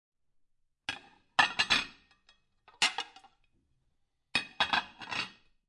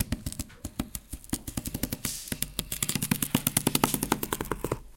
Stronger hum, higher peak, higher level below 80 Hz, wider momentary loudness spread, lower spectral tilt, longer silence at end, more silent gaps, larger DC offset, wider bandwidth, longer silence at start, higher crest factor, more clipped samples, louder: neither; second, -10 dBFS vs -2 dBFS; second, -66 dBFS vs -44 dBFS; first, 15 LU vs 12 LU; second, -0.5 dB/octave vs -3.5 dB/octave; first, 0.4 s vs 0.05 s; neither; neither; second, 11.5 kHz vs 17 kHz; first, 0.9 s vs 0 s; about the same, 26 dB vs 28 dB; neither; about the same, -31 LUFS vs -30 LUFS